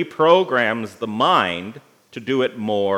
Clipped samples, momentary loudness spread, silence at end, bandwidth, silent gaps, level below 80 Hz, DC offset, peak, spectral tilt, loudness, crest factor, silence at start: under 0.1%; 16 LU; 0 s; 12.5 kHz; none; -72 dBFS; under 0.1%; 0 dBFS; -5.5 dB/octave; -19 LUFS; 18 dB; 0 s